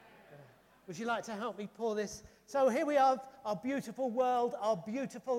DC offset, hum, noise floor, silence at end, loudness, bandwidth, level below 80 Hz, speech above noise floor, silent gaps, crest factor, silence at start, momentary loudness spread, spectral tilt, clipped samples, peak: under 0.1%; none; -60 dBFS; 0 s; -34 LUFS; 15.5 kHz; -74 dBFS; 27 dB; none; 16 dB; 0.3 s; 12 LU; -5 dB/octave; under 0.1%; -18 dBFS